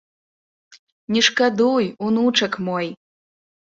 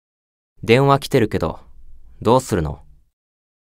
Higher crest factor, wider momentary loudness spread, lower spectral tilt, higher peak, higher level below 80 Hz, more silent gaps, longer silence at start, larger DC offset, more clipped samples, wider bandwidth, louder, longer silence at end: about the same, 20 dB vs 20 dB; second, 9 LU vs 17 LU; second, -3.5 dB/octave vs -6 dB/octave; about the same, -2 dBFS vs 0 dBFS; second, -64 dBFS vs -40 dBFS; first, 0.79-1.08 s vs none; about the same, 0.7 s vs 0.65 s; neither; neither; second, 7.8 kHz vs 16 kHz; about the same, -19 LUFS vs -18 LUFS; second, 0.75 s vs 0.95 s